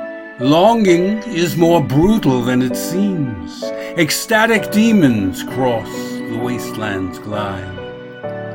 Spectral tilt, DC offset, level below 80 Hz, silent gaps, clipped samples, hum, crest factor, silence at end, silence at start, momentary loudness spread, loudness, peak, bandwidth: -5.5 dB/octave; under 0.1%; -42 dBFS; none; under 0.1%; none; 16 dB; 0 s; 0 s; 14 LU; -16 LUFS; 0 dBFS; 16.5 kHz